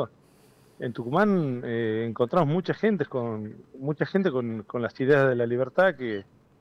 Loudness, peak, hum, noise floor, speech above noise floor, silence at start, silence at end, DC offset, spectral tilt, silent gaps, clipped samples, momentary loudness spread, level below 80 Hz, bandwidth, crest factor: -26 LUFS; -10 dBFS; none; -57 dBFS; 32 dB; 0 s; 0.4 s; under 0.1%; -8.5 dB/octave; none; under 0.1%; 13 LU; -64 dBFS; 8.2 kHz; 18 dB